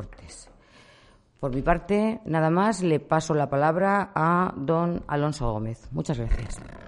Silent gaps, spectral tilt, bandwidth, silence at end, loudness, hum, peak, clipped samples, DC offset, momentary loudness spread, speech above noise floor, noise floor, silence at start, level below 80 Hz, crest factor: none; -7 dB/octave; 11.5 kHz; 0 s; -25 LUFS; none; -6 dBFS; under 0.1%; under 0.1%; 11 LU; 32 dB; -56 dBFS; 0 s; -38 dBFS; 18 dB